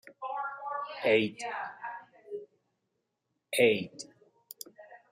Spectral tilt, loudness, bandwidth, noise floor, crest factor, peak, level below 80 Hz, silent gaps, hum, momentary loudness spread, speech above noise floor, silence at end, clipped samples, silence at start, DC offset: -4 dB/octave; -30 LUFS; 15 kHz; -82 dBFS; 22 dB; -12 dBFS; -78 dBFS; none; none; 21 LU; 54 dB; 0.15 s; under 0.1%; 0.05 s; under 0.1%